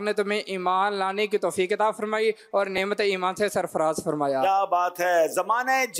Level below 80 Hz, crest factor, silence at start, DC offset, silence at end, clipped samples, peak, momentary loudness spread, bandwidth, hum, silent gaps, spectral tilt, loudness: -68 dBFS; 12 dB; 0 s; under 0.1%; 0 s; under 0.1%; -12 dBFS; 4 LU; 16 kHz; none; none; -3.5 dB/octave; -24 LUFS